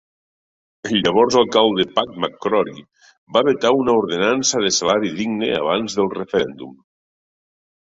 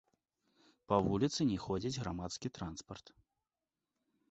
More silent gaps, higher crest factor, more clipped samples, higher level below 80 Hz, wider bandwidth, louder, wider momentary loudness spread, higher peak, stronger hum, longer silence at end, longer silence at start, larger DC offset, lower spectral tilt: first, 3.18-3.27 s vs none; second, 18 dB vs 24 dB; neither; about the same, -56 dBFS vs -60 dBFS; about the same, 8 kHz vs 8 kHz; first, -18 LUFS vs -37 LUFS; second, 9 LU vs 15 LU; first, -2 dBFS vs -16 dBFS; neither; second, 1.1 s vs 1.3 s; about the same, 0.85 s vs 0.9 s; neither; second, -3.5 dB/octave vs -6 dB/octave